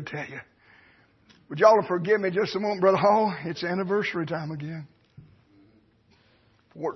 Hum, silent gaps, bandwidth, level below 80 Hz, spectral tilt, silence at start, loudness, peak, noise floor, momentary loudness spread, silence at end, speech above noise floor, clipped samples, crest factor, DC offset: none; none; 6.2 kHz; -68 dBFS; -6.5 dB/octave; 0 s; -24 LUFS; -4 dBFS; -62 dBFS; 18 LU; 0 s; 38 dB; under 0.1%; 22 dB; under 0.1%